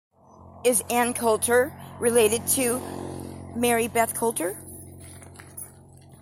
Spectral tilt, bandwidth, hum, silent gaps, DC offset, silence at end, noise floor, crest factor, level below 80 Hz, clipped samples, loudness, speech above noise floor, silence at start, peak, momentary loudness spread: -3 dB/octave; 16.5 kHz; none; none; under 0.1%; 0.05 s; -49 dBFS; 20 dB; -60 dBFS; under 0.1%; -23 LUFS; 26 dB; 0.4 s; -6 dBFS; 21 LU